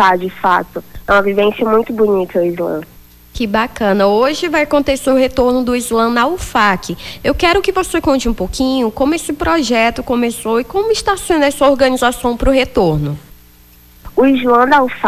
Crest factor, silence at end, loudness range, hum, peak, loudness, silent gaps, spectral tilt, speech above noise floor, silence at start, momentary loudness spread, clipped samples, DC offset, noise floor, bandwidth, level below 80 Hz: 12 dB; 0 s; 2 LU; none; 0 dBFS; -14 LUFS; none; -4.5 dB/octave; 30 dB; 0 s; 8 LU; under 0.1%; under 0.1%; -43 dBFS; 16 kHz; -32 dBFS